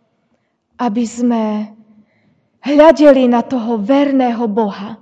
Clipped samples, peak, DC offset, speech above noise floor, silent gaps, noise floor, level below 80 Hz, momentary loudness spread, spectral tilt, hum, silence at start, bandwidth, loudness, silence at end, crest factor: 0.5%; 0 dBFS; under 0.1%; 51 dB; none; -63 dBFS; -52 dBFS; 13 LU; -6 dB/octave; none; 0.8 s; 8.6 kHz; -13 LUFS; 0.05 s; 14 dB